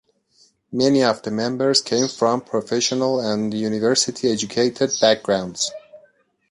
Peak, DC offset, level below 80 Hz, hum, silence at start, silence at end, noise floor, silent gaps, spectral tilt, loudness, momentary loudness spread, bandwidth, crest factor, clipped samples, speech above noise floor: -2 dBFS; under 0.1%; -62 dBFS; none; 0.7 s; 0.55 s; -59 dBFS; none; -3.5 dB/octave; -20 LUFS; 7 LU; 11.5 kHz; 18 dB; under 0.1%; 39 dB